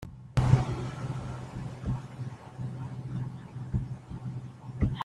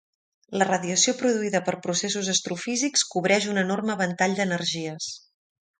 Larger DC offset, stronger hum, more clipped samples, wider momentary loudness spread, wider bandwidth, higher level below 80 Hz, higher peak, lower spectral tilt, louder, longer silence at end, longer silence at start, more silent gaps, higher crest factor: neither; neither; neither; first, 15 LU vs 9 LU; about the same, 10 kHz vs 10 kHz; first, -44 dBFS vs -70 dBFS; about the same, -8 dBFS vs -6 dBFS; first, -7.5 dB/octave vs -3 dB/octave; second, -34 LUFS vs -24 LUFS; second, 0 s vs 0.6 s; second, 0 s vs 0.5 s; neither; about the same, 24 dB vs 20 dB